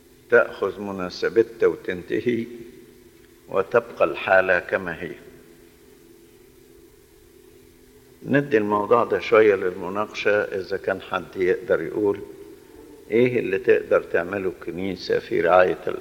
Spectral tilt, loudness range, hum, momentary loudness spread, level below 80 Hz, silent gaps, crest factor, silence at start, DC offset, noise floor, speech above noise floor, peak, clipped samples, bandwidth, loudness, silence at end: -6.5 dB/octave; 5 LU; none; 12 LU; -58 dBFS; none; 20 dB; 0.3 s; under 0.1%; -52 dBFS; 30 dB; -2 dBFS; under 0.1%; 17 kHz; -22 LUFS; 0 s